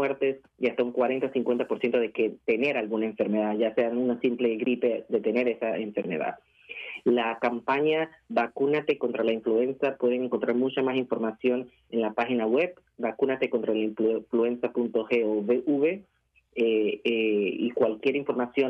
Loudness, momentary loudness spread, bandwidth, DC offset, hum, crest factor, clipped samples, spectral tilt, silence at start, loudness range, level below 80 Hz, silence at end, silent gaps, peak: -27 LUFS; 5 LU; 6 kHz; under 0.1%; none; 14 dB; under 0.1%; -7.5 dB/octave; 0 s; 1 LU; -74 dBFS; 0 s; none; -12 dBFS